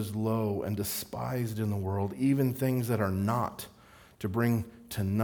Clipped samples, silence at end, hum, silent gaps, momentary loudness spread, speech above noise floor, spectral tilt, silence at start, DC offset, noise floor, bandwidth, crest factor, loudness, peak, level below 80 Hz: under 0.1%; 0 s; none; none; 8 LU; 25 dB; -6.5 dB/octave; 0 s; under 0.1%; -55 dBFS; over 20 kHz; 18 dB; -31 LUFS; -12 dBFS; -62 dBFS